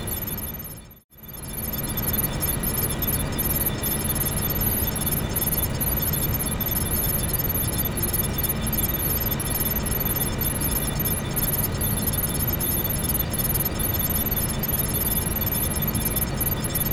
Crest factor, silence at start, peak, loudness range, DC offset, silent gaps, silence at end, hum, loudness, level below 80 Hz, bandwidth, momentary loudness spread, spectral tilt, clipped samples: 14 dB; 0 s; -10 dBFS; 1 LU; under 0.1%; 1.04-1.09 s; 0 s; none; -23 LUFS; -34 dBFS; 18 kHz; 3 LU; -4 dB/octave; under 0.1%